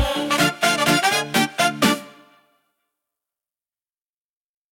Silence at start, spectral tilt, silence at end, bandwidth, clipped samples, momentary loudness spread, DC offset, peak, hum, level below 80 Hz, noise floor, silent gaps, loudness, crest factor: 0 s; -3 dB/octave; 2.6 s; 17 kHz; under 0.1%; 4 LU; under 0.1%; -4 dBFS; none; -44 dBFS; under -90 dBFS; none; -19 LUFS; 20 dB